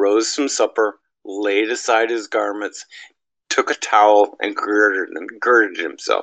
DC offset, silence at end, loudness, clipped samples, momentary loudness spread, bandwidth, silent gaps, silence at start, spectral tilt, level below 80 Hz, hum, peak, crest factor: under 0.1%; 0 s; -18 LUFS; under 0.1%; 13 LU; 9.4 kHz; none; 0 s; -1 dB/octave; -76 dBFS; none; 0 dBFS; 18 dB